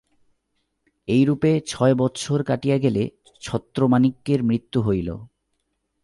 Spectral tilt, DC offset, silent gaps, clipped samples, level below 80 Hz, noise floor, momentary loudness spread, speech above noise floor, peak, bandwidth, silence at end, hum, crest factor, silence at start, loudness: -7 dB/octave; under 0.1%; none; under 0.1%; -50 dBFS; -74 dBFS; 11 LU; 53 dB; -6 dBFS; 11.5 kHz; 0.75 s; none; 16 dB; 1.1 s; -21 LUFS